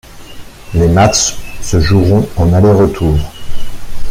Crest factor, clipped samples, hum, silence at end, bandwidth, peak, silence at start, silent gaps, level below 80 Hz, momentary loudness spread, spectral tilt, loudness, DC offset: 10 dB; under 0.1%; none; 0 s; 15.5 kHz; 0 dBFS; 0.1 s; none; -24 dBFS; 21 LU; -5.5 dB/octave; -11 LUFS; under 0.1%